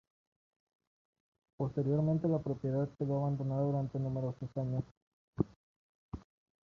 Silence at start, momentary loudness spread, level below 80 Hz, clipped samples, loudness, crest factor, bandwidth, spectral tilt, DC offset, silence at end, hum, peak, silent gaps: 1.6 s; 18 LU; -62 dBFS; under 0.1%; -35 LUFS; 22 dB; 6.4 kHz; -11.5 dB/octave; under 0.1%; 0.45 s; none; -16 dBFS; 4.91-5.33 s, 5.56-6.12 s